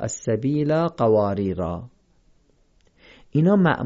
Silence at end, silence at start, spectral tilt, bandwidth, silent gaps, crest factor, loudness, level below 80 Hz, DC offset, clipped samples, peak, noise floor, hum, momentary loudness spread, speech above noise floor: 0 s; 0 s; -7 dB/octave; 7.8 kHz; none; 16 dB; -22 LUFS; -48 dBFS; under 0.1%; under 0.1%; -6 dBFS; -60 dBFS; none; 10 LU; 40 dB